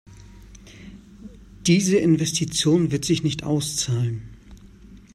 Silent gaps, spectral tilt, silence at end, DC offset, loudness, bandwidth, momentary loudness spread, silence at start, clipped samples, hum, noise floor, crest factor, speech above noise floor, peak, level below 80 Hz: none; -5 dB/octave; 0.15 s; under 0.1%; -21 LUFS; 14 kHz; 16 LU; 0.1 s; under 0.1%; none; -46 dBFS; 18 dB; 25 dB; -6 dBFS; -48 dBFS